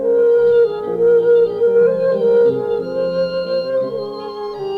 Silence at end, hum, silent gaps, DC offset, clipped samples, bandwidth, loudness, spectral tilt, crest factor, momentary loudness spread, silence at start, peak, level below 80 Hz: 0 s; none; none; under 0.1%; under 0.1%; 5 kHz; -15 LUFS; -7.5 dB/octave; 10 dB; 12 LU; 0 s; -6 dBFS; -56 dBFS